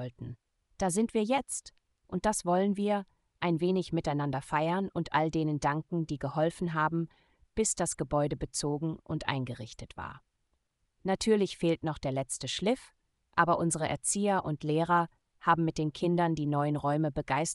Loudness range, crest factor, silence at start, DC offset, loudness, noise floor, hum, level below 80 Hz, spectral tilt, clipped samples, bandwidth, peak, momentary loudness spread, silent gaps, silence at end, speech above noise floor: 4 LU; 20 dB; 0 s; under 0.1%; -31 LUFS; -78 dBFS; none; -56 dBFS; -5 dB/octave; under 0.1%; 13.5 kHz; -10 dBFS; 10 LU; none; 0 s; 48 dB